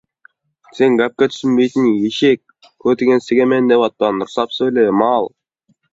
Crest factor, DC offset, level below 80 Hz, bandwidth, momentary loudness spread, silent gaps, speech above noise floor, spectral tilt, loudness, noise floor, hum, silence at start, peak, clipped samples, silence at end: 14 dB; under 0.1%; -60 dBFS; 7.8 kHz; 6 LU; none; 48 dB; -6 dB/octave; -15 LUFS; -62 dBFS; none; 0.75 s; 0 dBFS; under 0.1%; 0.65 s